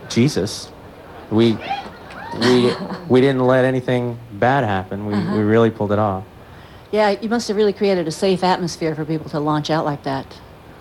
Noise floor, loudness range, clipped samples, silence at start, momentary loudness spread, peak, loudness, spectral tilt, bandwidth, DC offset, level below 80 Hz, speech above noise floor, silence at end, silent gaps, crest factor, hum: -40 dBFS; 2 LU; under 0.1%; 0 s; 13 LU; -4 dBFS; -19 LUFS; -6 dB/octave; 14 kHz; under 0.1%; -52 dBFS; 22 dB; 0.05 s; none; 16 dB; none